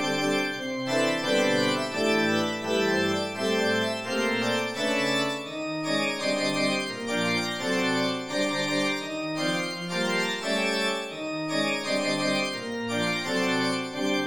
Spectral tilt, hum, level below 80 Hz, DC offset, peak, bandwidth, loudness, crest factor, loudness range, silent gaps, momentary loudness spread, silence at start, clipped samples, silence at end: -3.5 dB/octave; none; -68 dBFS; 0.3%; -12 dBFS; 17 kHz; -26 LUFS; 16 dB; 2 LU; none; 5 LU; 0 s; under 0.1%; 0 s